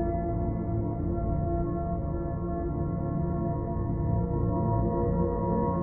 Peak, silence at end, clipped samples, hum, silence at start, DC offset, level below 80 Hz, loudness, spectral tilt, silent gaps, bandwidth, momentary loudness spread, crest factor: -16 dBFS; 0 s; under 0.1%; none; 0 s; under 0.1%; -36 dBFS; -30 LUFS; -14 dB/octave; none; 2.3 kHz; 4 LU; 12 dB